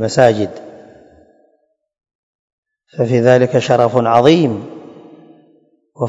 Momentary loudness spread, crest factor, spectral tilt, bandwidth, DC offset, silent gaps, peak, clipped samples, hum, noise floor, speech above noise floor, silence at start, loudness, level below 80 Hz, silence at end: 22 LU; 16 dB; -6.5 dB/octave; 8.6 kHz; under 0.1%; 2.15-2.63 s; 0 dBFS; 0.3%; none; -62 dBFS; 50 dB; 0 s; -13 LUFS; -56 dBFS; 0 s